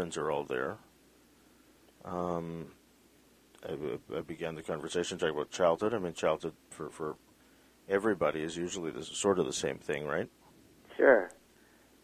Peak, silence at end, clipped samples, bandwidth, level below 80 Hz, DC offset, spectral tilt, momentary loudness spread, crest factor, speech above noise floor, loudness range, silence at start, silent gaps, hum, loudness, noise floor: -10 dBFS; 0.7 s; under 0.1%; 15.5 kHz; -64 dBFS; under 0.1%; -4.5 dB/octave; 16 LU; 26 dB; 31 dB; 10 LU; 0 s; none; none; -33 LUFS; -63 dBFS